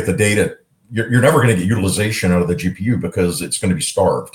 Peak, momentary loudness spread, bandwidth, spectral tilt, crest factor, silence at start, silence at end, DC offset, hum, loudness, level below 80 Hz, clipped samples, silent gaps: 0 dBFS; 7 LU; 17.5 kHz; -5 dB/octave; 16 dB; 0 s; 0.05 s; under 0.1%; none; -17 LUFS; -48 dBFS; under 0.1%; none